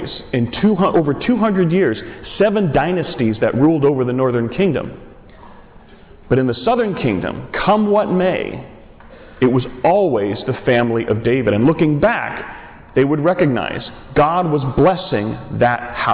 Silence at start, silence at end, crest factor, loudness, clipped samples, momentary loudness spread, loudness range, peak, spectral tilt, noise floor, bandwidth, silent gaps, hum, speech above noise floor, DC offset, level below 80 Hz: 0 s; 0 s; 10 dB; -17 LUFS; under 0.1%; 8 LU; 3 LU; -6 dBFS; -11 dB/octave; -42 dBFS; 4 kHz; none; none; 26 dB; under 0.1%; -42 dBFS